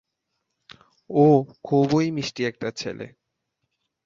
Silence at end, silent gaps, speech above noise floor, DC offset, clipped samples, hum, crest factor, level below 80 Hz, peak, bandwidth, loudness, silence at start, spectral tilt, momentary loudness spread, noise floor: 1 s; none; 57 dB; under 0.1%; under 0.1%; none; 20 dB; -64 dBFS; -4 dBFS; 7.6 kHz; -22 LUFS; 1.1 s; -7 dB/octave; 16 LU; -79 dBFS